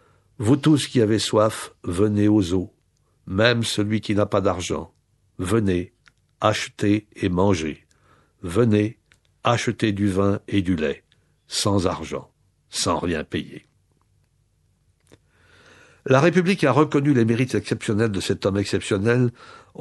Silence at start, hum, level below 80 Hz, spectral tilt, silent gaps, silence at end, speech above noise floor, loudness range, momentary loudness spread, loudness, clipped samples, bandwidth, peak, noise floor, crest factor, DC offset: 0.4 s; none; -52 dBFS; -5.5 dB/octave; none; 0.25 s; 43 dB; 6 LU; 12 LU; -22 LUFS; under 0.1%; 12 kHz; -2 dBFS; -64 dBFS; 20 dB; under 0.1%